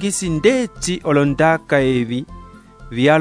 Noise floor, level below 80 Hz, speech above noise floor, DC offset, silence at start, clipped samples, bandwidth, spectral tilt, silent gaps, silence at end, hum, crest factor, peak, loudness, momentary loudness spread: -39 dBFS; -40 dBFS; 23 dB; under 0.1%; 0 s; under 0.1%; 11 kHz; -5 dB/octave; none; 0 s; none; 16 dB; 0 dBFS; -17 LUFS; 10 LU